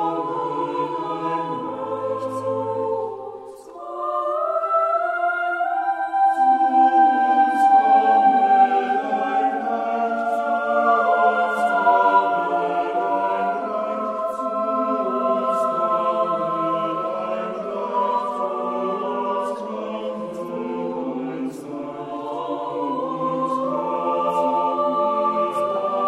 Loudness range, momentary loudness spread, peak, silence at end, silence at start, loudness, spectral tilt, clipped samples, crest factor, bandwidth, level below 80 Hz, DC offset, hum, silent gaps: 10 LU; 12 LU; -4 dBFS; 0 s; 0 s; -21 LUFS; -6 dB/octave; under 0.1%; 16 dB; 11.5 kHz; -68 dBFS; under 0.1%; none; none